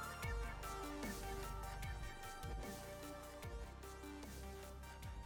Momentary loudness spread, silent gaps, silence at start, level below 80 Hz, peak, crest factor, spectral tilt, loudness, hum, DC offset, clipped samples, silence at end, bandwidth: 7 LU; none; 0 s; -52 dBFS; -32 dBFS; 16 dB; -4.5 dB/octave; -50 LUFS; none; under 0.1%; under 0.1%; 0 s; over 20 kHz